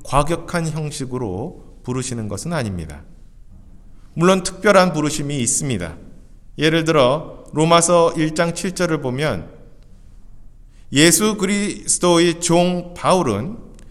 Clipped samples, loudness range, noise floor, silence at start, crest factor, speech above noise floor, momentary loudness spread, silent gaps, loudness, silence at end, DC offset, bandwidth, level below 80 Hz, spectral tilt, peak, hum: under 0.1%; 8 LU; -41 dBFS; 0 s; 20 dB; 24 dB; 14 LU; none; -18 LUFS; 0 s; under 0.1%; 15.5 kHz; -40 dBFS; -4 dB/octave; 0 dBFS; none